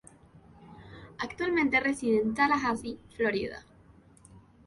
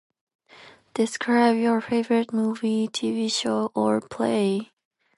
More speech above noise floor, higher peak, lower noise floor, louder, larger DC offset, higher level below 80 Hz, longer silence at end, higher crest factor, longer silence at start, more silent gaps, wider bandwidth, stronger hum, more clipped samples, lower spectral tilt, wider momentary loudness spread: about the same, 29 dB vs 27 dB; second, -12 dBFS vs -8 dBFS; first, -57 dBFS vs -50 dBFS; second, -28 LUFS vs -24 LUFS; neither; first, -58 dBFS vs -70 dBFS; second, 0.3 s vs 0.55 s; about the same, 20 dB vs 18 dB; about the same, 0.6 s vs 0.6 s; neither; about the same, 11.5 kHz vs 11.5 kHz; neither; neither; about the same, -5 dB/octave vs -4.5 dB/octave; first, 22 LU vs 6 LU